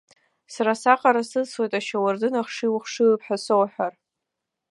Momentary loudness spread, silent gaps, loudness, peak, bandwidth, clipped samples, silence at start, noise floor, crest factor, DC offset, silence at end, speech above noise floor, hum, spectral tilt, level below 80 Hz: 8 LU; none; -23 LUFS; -2 dBFS; 11.5 kHz; under 0.1%; 0.5 s; -83 dBFS; 22 dB; under 0.1%; 0.8 s; 61 dB; none; -4.5 dB/octave; -82 dBFS